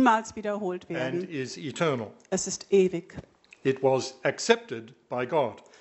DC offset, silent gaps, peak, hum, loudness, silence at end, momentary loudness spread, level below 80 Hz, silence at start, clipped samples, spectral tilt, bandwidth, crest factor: under 0.1%; none; -6 dBFS; none; -28 LUFS; 0.2 s; 12 LU; -66 dBFS; 0 s; under 0.1%; -4.5 dB/octave; 8.2 kHz; 22 dB